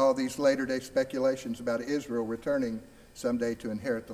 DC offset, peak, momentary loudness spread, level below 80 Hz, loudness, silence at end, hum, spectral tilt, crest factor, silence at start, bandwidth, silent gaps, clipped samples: under 0.1%; -14 dBFS; 8 LU; -60 dBFS; -31 LUFS; 0 s; none; -5 dB/octave; 16 dB; 0 s; 16 kHz; none; under 0.1%